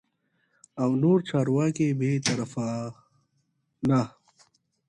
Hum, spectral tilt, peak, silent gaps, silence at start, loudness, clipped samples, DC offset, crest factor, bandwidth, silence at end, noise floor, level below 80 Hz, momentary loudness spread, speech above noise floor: none; -6.5 dB/octave; -10 dBFS; none; 0.75 s; -26 LUFS; under 0.1%; under 0.1%; 18 dB; 11 kHz; 0.8 s; -73 dBFS; -66 dBFS; 12 LU; 49 dB